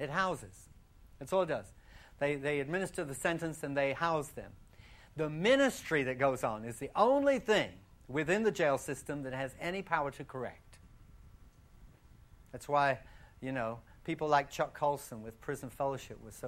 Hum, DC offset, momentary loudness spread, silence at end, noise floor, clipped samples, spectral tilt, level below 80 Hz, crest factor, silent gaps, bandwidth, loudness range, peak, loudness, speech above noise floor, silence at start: none; under 0.1%; 16 LU; 0 s; -59 dBFS; under 0.1%; -5 dB/octave; -60 dBFS; 22 dB; none; 16 kHz; 8 LU; -14 dBFS; -34 LUFS; 25 dB; 0 s